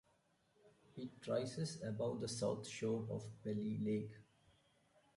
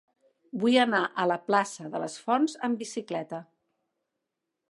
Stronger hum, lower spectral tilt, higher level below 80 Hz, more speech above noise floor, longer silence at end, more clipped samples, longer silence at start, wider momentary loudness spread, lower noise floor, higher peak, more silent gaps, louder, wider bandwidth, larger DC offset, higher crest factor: neither; first, -6 dB/octave vs -4 dB/octave; first, -76 dBFS vs -84 dBFS; second, 35 dB vs 57 dB; second, 0.95 s vs 1.25 s; neither; about the same, 0.65 s vs 0.55 s; about the same, 11 LU vs 12 LU; second, -77 dBFS vs -84 dBFS; second, -26 dBFS vs -8 dBFS; neither; second, -43 LUFS vs -27 LUFS; about the same, 11.5 kHz vs 11.5 kHz; neither; about the same, 18 dB vs 20 dB